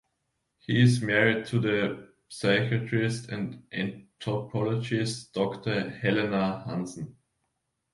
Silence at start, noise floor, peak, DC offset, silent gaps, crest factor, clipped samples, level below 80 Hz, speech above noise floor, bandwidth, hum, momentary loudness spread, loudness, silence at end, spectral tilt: 0.7 s; -79 dBFS; -6 dBFS; under 0.1%; none; 22 dB; under 0.1%; -62 dBFS; 52 dB; 11.5 kHz; none; 13 LU; -28 LUFS; 0.85 s; -6 dB/octave